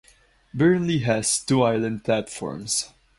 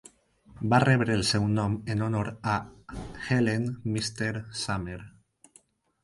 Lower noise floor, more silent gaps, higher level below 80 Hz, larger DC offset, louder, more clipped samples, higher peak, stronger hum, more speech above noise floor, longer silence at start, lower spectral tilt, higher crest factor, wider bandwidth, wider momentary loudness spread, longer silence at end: second, -57 dBFS vs -62 dBFS; neither; about the same, -54 dBFS vs -52 dBFS; neither; first, -23 LUFS vs -28 LUFS; neither; about the same, -6 dBFS vs -6 dBFS; neither; about the same, 35 dB vs 35 dB; about the same, 0.55 s vs 0.55 s; about the same, -4.5 dB/octave vs -5.5 dB/octave; about the same, 18 dB vs 22 dB; about the same, 11.5 kHz vs 11.5 kHz; second, 9 LU vs 15 LU; second, 0.3 s vs 0.95 s